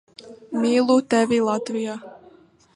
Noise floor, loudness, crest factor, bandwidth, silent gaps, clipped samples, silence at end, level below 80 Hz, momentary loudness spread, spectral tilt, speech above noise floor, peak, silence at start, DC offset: -52 dBFS; -21 LUFS; 16 dB; 11 kHz; none; under 0.1%; 0.6 s; -66 dBFS; 12 LU; -4.5 dB/octave; 32 dB; -6 dBFS; 0.25 s; under 0.1%